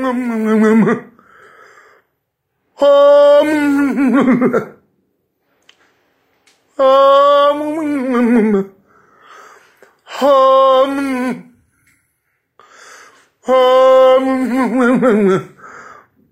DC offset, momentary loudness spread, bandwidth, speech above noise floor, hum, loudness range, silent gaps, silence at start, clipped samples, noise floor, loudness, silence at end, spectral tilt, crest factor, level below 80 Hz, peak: under 0.1%; 12 LU; 13 kHz; 59 dB; none; 4 LU; none; 0 s; under 0.1%; -70 dBFS; -12 LUFS; 0.5 s; -6.5 dB/octave; 14 dB; -60 dBFS; 0 dBFS